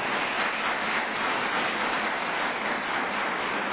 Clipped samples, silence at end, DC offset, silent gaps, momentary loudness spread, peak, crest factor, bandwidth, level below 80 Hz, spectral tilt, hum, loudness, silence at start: under 0.1%; 0 s; under 0.1%; none; 2 LU; -14 dBFS; 14 dB; 4 kHz; -62 dBFS; -0.5 dB/octave; none; -27 LUFS; 0 s